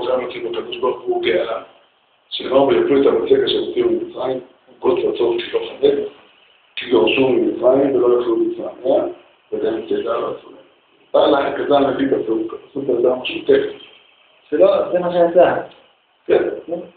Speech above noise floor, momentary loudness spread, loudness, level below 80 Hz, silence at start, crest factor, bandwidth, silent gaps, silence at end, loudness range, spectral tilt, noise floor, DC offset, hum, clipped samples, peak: 40 dB; 13 LU; -18 LUFS; -56 dBFS; 0 s; 16 dB; 4.6 kHz; none; 0.1 s; 3 LU; -3.5 dB/octave; -57 dBFS; under 0.1%; none; under 0.1%; -2 dBFS